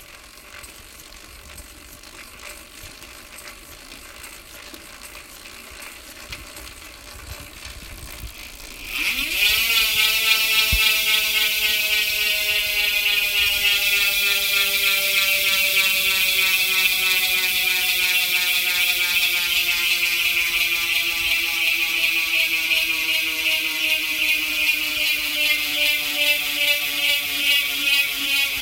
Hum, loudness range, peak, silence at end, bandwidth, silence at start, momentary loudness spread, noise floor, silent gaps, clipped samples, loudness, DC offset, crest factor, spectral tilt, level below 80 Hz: none; 21 LU; -2 dBFS; 0 s; 17 kHz; 0 s; 21 LU; -43 dBFS; none; under 0.1%; -17 LUFS; under 0.1%; 20 dB; 1 dB/octave; -46 dBFS